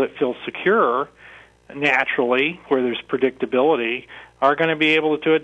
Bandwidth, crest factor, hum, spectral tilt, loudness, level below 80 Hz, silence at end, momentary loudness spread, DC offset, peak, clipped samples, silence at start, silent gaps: 8.4 kHz; 16 dB; none; -6 dB/octave; -20 LUFS; -62 dBFS; 0 s; 8 LU; under 0.1%; -4 dBFS; under 0.1%; 0 s; none